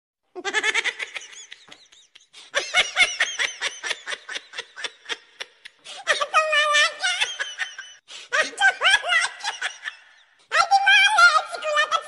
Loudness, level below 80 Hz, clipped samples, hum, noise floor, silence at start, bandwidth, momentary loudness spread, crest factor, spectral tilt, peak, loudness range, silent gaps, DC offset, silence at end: -20 LUFS; -66 dBFS; under 0.1%; none; -55 dBFS; 0.35 s; 11.5 kHz; 20 LU; 18 dB; 2 dB/octave; -4 dBFS; 7 LU; none; under 0.1%; 0 s